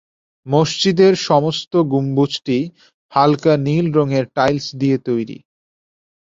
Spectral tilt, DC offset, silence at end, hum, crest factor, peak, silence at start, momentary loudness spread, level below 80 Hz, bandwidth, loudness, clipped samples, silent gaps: -6 dB/octave; under 0.1%; 0.95 s; none; 16 dB; -2 dBFS; 0.45 s; 8 LU; -54 dBFS; 7.8 kHz; -17 LUFS; under 0.1%; 1.67-1.71 s, 2.94-3.09 s